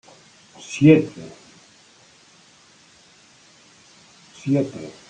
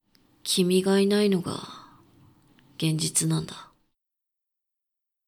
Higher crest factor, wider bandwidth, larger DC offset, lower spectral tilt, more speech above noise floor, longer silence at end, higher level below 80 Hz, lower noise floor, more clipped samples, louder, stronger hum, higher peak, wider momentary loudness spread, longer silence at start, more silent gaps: about the same, 22 dB vs 18 dB; second, 9.2 kHz vs 19 kHz; neither; first, -7 dB/octave vs -4.5 dB/octave; second, 34 dB vs 61 dB; second, 0.2 s vs 1.65 s; about the same, -64 dBFS vs -66 dBFS; second, -53 dBFS vs -85 dBFS; neither; first, -19 LUFS vs -24 LUFS; neither; first, -2 dBFS vs -10 dBFS; first, 26 LU vs 16 LU; first, 0.7 s vs 0.45 s; neither